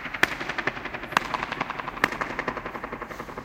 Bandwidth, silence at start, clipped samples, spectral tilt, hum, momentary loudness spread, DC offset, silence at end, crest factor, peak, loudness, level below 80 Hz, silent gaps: 17 kHz; 0 s; under 0.1%; -3.5 dB/octave; none; 10 LU; under 0.1%; 0 s; 26 dB; -2 dBFS; -29 LUFS; -52 dBFS; none